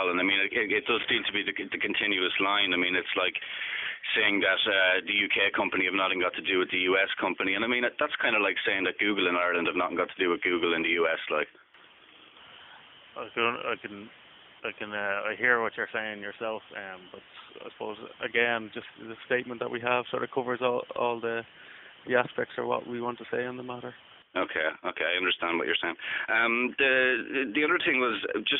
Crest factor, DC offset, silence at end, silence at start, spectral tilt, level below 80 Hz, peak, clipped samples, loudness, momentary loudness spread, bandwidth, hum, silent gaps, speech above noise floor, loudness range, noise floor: 20 dB; under 0.1%; 0 s; 0 s; 0 dB/octave; -72 dBFS; -8 dBFS; under 0.1%; -27 LUFS; 15 LU; 4.1 kHz; none; none; 27 dB; 8 LU; -56 dBFS